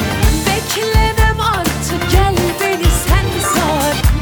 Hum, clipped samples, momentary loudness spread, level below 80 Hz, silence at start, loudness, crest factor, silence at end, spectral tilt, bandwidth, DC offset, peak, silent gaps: none; under 0.1%; 3 LU; -18 dBFS; 0 s; -14 LUFS; 12 dB; 0 s; -4.5 dB/octave; over 20 kHz; under 0.1%; -2 dBFS; none